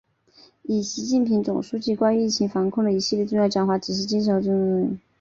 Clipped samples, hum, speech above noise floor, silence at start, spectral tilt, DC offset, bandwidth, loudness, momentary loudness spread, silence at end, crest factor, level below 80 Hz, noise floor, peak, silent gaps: under 0.1%; none; 33 dB; 0.7 s; -5.5 dB/octave; under 0.1%; 7.6 kHz; -23 LUFS; 5 LU; 0.25 s; 16 dB; -60 dBFS; -55 dBFS; -8 dBFS; none